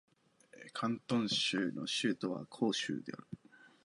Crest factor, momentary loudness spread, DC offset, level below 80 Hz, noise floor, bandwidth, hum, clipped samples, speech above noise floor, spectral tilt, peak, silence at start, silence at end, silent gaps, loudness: 18 dB; 18 LU; under 0.1%; -80 dBFS; -64 dBFS; 11.5 kHz; none; under 0.1%; 28 dB; -4 dB/octave; -20 dBFS; 0.55 s; 0.2 s; none; -36 LUFS